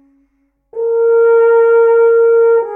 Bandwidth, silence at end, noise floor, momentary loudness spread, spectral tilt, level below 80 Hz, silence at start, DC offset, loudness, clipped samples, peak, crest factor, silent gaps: 2.9 kHz; 0 s; -61 dBFS; 9 LU; -5.5 dB/octave; -68 dBFS; 0.75 s; under 0.1%; -10 LUFS; under 0.1%; -2 dBFS; 8 dB; none